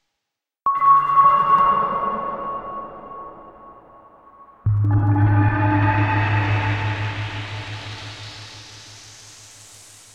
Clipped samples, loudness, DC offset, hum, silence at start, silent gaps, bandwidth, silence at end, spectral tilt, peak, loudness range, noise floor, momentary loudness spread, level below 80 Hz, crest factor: under 0.1%; -19 LUFS; under 0.1%; none; 0.65 s; none; 9.4 kHz; 0.8 s; -6.5 dB/octave; -4 dBFS; 9 LU; -82 dBFS; 24 LU; -44 dBFS; 16 dB